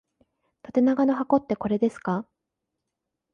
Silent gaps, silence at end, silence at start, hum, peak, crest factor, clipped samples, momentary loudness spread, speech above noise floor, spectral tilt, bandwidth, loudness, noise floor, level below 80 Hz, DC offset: none; 1.1 s; 0.7 s; none; -8 dBFS; 18 dB; under 0.1%; 8 LU; 60 dB; -8.5 dB/octave; 9 kHz; -25 LUFS; -83 dBFS; -64 dBFS; under 0.1%